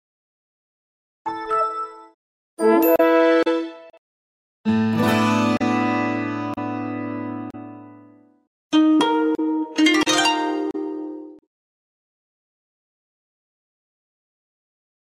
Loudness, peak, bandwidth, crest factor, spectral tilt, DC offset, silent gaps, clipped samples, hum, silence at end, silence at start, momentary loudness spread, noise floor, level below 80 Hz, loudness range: -20 LUFS; -4 dBFS; 15 kHz; 18 dB; -4.5 dB/octave; under 0.1%; 2.14-2.57 s, 3.98-4.64 s, 8.47-8.70 s; under 0.1%; none; 3.7 s; 1.25 s; 16 LU; -50 dBFS; -66 dBFS; 6 LU